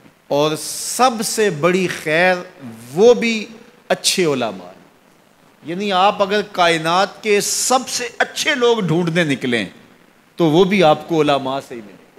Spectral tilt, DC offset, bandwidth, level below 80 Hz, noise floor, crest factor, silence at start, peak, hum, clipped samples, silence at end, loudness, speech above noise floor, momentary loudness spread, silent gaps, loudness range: -3.5 dB/octave; under 0.1%; 16 kHz; -60 dBFS; -51 dBFS; 16 dB; 0.3 s; -2 dBFS; none; under 0.1%; 0.25 s; -17 LUFS; 35 dB; 11 LU; none; 2 LU